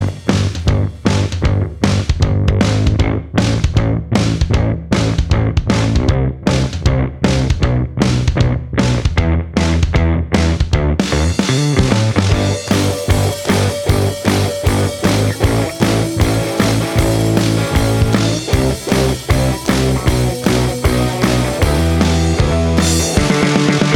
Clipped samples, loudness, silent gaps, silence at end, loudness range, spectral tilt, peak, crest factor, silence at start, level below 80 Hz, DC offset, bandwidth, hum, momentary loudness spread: under 0.1%; -15 LUFS; none; 0 s; 1 LU; -5.5 dB/octave; 0 dBFS; 14 dB; 0 s; -22 dBFS; under 0.1%; 17 kHz; none; 3 LU